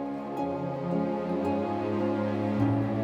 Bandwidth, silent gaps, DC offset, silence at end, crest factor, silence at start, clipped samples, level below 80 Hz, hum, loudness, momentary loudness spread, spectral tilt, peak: 8 kHz; none; under 0.1%; 0 s; 14 dB; 0 s; under 0.1%; -58 dBFS; none; -29 LUFS; 6 LU; -9 dB/octave; -14 dBFS